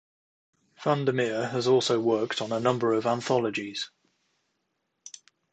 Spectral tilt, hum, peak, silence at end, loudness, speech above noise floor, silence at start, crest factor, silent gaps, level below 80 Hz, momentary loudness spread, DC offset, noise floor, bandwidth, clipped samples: -5 dB/octave; none; -10 dBFS; 0.45 s; -27 LUFS; 53 dB; 0.8 s; 20 dB; none; -72 dBFS; 13 LU; under 0.1%; -78 dBFS; 9 kHz; under 0.1%